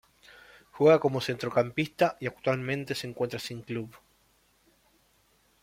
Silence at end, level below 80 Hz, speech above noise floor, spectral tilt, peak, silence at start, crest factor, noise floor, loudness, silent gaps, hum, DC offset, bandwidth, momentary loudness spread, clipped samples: 1.65 s; -66 dBFS; 39 dB; -6 dB/octave; -8 dBFS; 0.75 s; 22 dB; -67 dBFS; -28 LUFS; none; none; under 0.1%; 16 kHz; 15 LU; under 0.1%